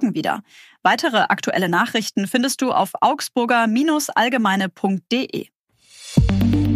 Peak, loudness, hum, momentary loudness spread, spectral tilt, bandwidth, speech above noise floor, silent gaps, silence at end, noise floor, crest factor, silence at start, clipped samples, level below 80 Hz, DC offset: -2 dBFS; -19 LUFS; none; 6 LU; -5 dB/octave; 15.5 kHz; 28 dB; 5.55-5.67 s; 0 s; -48 dBFS; 18 dB; 0 s; under 0.1%; -36 dBFS; under 0.1%